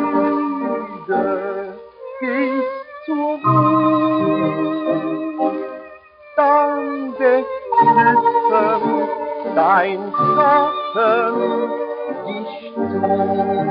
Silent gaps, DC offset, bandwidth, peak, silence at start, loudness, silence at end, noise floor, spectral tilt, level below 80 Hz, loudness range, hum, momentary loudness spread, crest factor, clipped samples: none; under 0.1%; 5.4 kHz; -2 dBFS; 0 s; -18 LUFS; 0 s; -41 dBFS; -5.5 dB/octave; -62 dBFS; 4 LU; none; 12 LU; 14 dB; under 0.1%